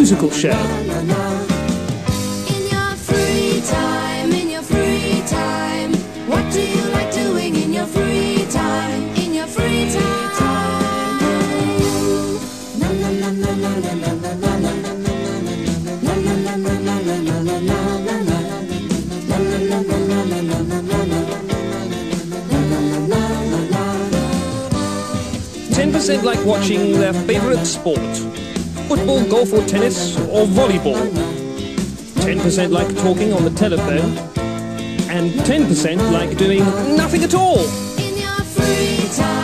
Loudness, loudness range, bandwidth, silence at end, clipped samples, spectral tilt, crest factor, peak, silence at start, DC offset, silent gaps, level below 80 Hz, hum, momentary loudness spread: -18 LUFS; 3 LU; 13 kHz; 0 s; under 0.1%; -5 dB/octave; 16 dB; 0 dBFS; 0 s; 0.3%; none; -36 dBFS; none; 7 LU